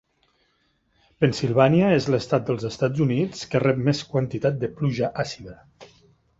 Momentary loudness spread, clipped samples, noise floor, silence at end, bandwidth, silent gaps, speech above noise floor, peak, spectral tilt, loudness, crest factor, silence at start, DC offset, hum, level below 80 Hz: 9 LU; under 0.1%; -67 dBFS; 0.55 s; 7.8 kHz; none; 45 dB; -4 dBFS; -7 dB/octave; -23 LUFS; 20 dB; 1.2 s; under 0.1%; none; -54 dBFS